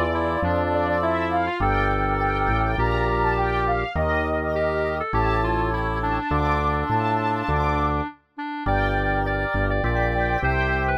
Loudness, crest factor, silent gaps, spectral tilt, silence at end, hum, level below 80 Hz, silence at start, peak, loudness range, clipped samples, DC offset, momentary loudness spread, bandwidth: -23 LUFS; 14 dB; none; -8 dB/octave; 0 s; none; -30 dBFS; 0 s; -8 dBFS; 1 LU; under 0.1%; under 0.1%; 3 LU; 7.4 kHz